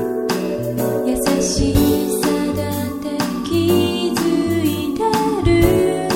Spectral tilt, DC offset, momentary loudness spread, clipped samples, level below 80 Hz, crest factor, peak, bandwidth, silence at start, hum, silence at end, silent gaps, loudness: -5.5 dB/octave; under 0.1%; 7 LU; under 0.1%; -32 dBFS; 16 dB; -2 dBFS; 16.5 kHz; 0 s; none; 0 s; none; -18 LUFS